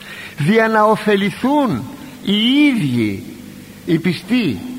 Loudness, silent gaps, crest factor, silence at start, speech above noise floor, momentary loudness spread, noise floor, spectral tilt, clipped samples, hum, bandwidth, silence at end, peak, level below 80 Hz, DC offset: -16 LUFS; none; 16 dB; 0 s; 20 dB; 18 LU; -35 dBFS; -6 dB/octave; under 0.1%; none; 16 kHz; 0 s; -2 dBFS; -52 dBFS; under 0.1%